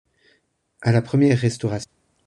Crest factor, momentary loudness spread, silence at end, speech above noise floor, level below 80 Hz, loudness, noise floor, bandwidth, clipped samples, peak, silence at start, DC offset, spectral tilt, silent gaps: 16 dB; 12 LU; 0.4 s; 46 dB; -54 dBFS; -21 LUFS; -65 dBFS; 10.5 kHz; under 0.1%; -6 dBFS; 0.8 s; under 0.1%; -7 dB/octave; none